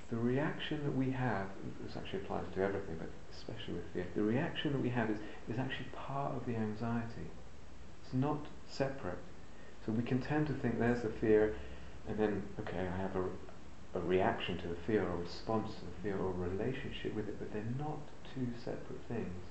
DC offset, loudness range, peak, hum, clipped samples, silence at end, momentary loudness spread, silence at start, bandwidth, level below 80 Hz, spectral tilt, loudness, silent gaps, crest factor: 0.6%; 5 LU; -18 dBFS; none; under 0.1%; 0 s; 14 LU; 0 s; 8.2 kHz; -58 dBFS; -7.5 dB/octave; -38 LUFS; none; 20 dB